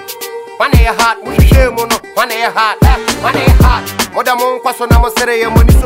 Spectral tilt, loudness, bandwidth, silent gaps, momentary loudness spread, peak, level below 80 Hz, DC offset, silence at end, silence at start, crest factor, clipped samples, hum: -5 dB/octave; -11 LUFS; 16.5 kHz; none; 7 LU; 0 dBFS; -14 dBFS; under 0.1%; 0 s; 0 s; 10 dB; under 0.1%; none